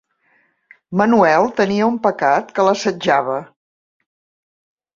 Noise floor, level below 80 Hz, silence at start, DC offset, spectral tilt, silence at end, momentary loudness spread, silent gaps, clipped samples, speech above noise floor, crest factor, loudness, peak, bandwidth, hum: -60 dBFS; -60 dBFS; 0.9 s; under 0.1%; -5.5 dB/octave; 1.5 s; 7 LU; none; under 0.1%; 45 dB; 16 dB; -16 LUFS; -2 dBFS; 7.6 kHz; none